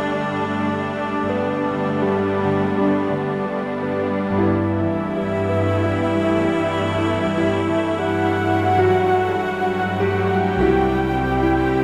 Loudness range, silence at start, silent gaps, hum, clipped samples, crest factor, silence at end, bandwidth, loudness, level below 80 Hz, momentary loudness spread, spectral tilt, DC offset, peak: 2 LU; 0 s; none; none; under 0.1%; 14 dB; 0 s; 12.5 kHz; -20 LUFS; -40 dBFS; 5 LU; -7.5 dB/octave; under 0.1%; -6 dBFS